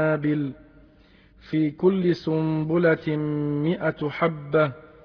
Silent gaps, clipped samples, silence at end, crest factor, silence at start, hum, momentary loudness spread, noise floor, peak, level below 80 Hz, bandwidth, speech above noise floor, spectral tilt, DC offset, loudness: none; under 0.1%; 0.2 s; 16 dB; 0 s; none; 5 LU; -54 dBFS; -8 dBFS; -58 dBFS; 5.4 kHz; 31 dB; -9.5 dB/octave; under 0.1%; -24 LUFS